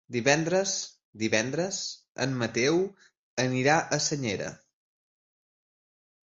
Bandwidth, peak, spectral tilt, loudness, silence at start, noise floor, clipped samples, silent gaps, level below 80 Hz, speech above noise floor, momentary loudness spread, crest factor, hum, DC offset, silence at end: 8.2 kHz; -8 dBFS; -3.5 dB/octave; -27 LUFS; 0.1 s; under -90 dBFS; under 0.1%; 1.05-1.13 s, 2.08-2.15 s, 3.17-3.37 s; -66 dBFS; over 63 dB; 11 LU; 22 dB; none; under 0.1%; 1.75 s